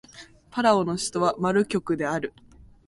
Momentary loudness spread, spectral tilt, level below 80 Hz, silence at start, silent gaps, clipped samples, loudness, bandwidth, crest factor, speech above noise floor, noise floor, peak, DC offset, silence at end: 10 LU; -5 dB/octave; -58 dBFS; 0.15 s; none; under 0.1%; -24 LUFS; 11.5 kHz; 18 dB; 25 dB; -49 dBFS; -6 dBFS; under 0.1%; 0.6 s